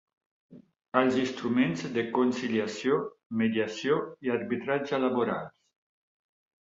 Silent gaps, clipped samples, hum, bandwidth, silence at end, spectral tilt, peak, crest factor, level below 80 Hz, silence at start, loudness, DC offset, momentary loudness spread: 3.26-3.30 s; under 0.1%; none; 7.8 kHz; 1.15 s; -6 dB/octave; -8 dBFS; 20 dB; -72 dBFS; 0.5 s; -29 LUFS; under 0.1%; 5 LU